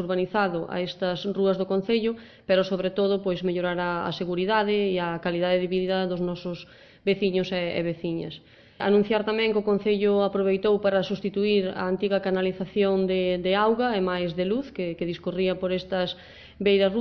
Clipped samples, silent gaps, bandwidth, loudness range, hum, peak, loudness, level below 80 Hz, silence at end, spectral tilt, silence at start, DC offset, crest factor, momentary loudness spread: under 0.1%; none; 6.2 kHz; 3 LU; none; -10 dBFS; -25 LUFS; -56 dBFS; 0 s; -7.5 dB/octave; 0 s; under 0.1%; 14 dB; 8 LU